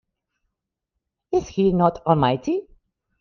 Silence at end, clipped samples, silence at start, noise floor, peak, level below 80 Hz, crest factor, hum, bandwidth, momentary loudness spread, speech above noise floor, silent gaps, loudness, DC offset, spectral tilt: 0.6 s; under 0.1%; 1.3 s; -82 dBFS; -4 dBFS; -48 dBFS; 20 dB; none; 6.8 kHz; 7 LU; 62 dB; none; -21 LUFS; under 0.1%; -7.5 dB/octave